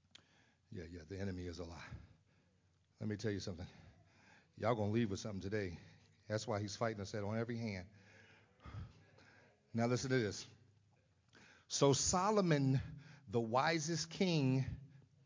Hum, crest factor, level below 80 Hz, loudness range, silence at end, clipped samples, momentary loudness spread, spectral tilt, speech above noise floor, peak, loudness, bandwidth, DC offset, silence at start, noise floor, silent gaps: none; 24 dB; -62 dBFS; 11 LU; 0.25 s; under 0.1%; 20 LU; -5 dB/octave; 37 dB; -18 dBFS; -39 LUFS; 7.6 kHz; under 0.1%; 0.7 s; -75 dBFS; none